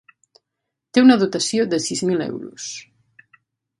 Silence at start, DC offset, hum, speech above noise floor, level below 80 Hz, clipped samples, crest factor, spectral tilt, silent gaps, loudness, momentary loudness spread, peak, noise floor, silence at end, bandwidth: 0.95 s; under 0.1%; none; 63 dB; -66 dBFS; under 0.1%; 20 dB; -4 dB/octave; none; -18 LUFS; 18 LU; 0 dBFS; -81 dBFS; 1 s; 11.5 kHz